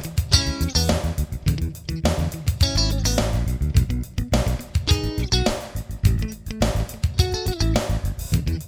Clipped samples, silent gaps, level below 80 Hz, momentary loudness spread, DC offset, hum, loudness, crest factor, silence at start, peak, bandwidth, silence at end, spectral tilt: under 0.1%; none; -26 dBFS; 7 LU; under 0.1%; none; -23 LUFS; 20 dB; 0 s; 0 dBFS; 19.5 kHz; 0 s; -5 dB/octave